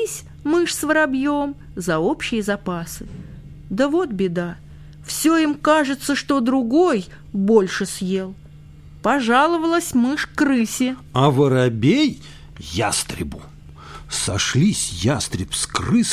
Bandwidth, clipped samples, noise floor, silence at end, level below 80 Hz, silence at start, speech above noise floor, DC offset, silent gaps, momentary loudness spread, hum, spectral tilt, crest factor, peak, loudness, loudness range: 15.5 kHz; under 0.1%; -42 dBFS; 0 s; -44 dBFS; 0 s; 22 dB; under 0.1%; none; 14 LU; none; -4.5 dB/octave; 18 dB; -2 dBFS; -20 LUFS; 4 LU